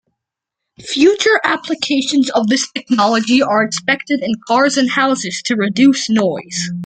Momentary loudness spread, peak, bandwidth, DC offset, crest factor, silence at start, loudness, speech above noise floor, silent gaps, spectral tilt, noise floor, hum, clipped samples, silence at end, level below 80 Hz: 6 LU; 0 dBFS; 9.4 kHz; under 0.1%; 14 dB; 0.8 s; -15 LUFS; 66 dB; none; -3.5 dB/octave; -81 dBFS; none; under 0.1%; 0 s; -60 dBFS